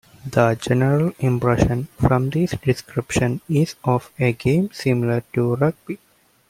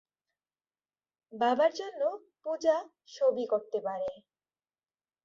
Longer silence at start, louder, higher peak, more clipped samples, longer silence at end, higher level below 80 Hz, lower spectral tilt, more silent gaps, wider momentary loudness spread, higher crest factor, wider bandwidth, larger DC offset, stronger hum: second, 0.25 s vs 1.3 s; first, -20 LUFS vs -31 LUFS; first, -2 dBFS vs -14 dBFS; neither; second, 0.55 s vs 1.05 s; first, -40 dBFS vs -80 dBFS; first, -7 dB/octave vs -4 dB/octave; neither; second, 5 LU vs 12 LU; about the same, 18 dB vs 18 dB; first, 15.5 kHz vs 7.4 kHz; neither; neither